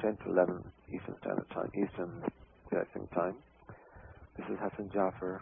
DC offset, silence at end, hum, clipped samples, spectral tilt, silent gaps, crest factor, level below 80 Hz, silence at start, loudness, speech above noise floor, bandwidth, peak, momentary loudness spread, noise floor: under 0.1%; 0 s; none; under 0.1%; -4 dB/octave; none; 22 dB; -62 dBFS; 0 s; -36 LUFS; 19 dB; 3.7 kHz; -14 dBFS; 23 LU; -55 dBFS